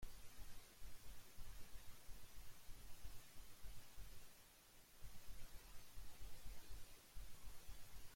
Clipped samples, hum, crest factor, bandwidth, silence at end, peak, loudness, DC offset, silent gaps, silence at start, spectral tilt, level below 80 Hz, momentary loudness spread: under 0.1%; none; 12 dB; 16.5 kHz; 0 s; -38 dBFS; -63 LUFS; under 0.1%; none; 0 s; -3 dB/octave; -60 dBFS; 2 LU